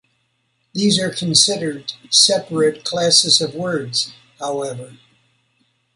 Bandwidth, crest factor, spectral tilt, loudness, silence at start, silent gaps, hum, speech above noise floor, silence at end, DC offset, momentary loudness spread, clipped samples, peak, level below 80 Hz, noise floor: 11.5 kHz; 20 dB; -2.5 dB/octave; -16 LUFS; 0.75 s; none; none; 49 dB; 1 s; under 0.1%; 16 LU; under 0.1%; 0 dBFS; -62 dBFS; -67 dBFS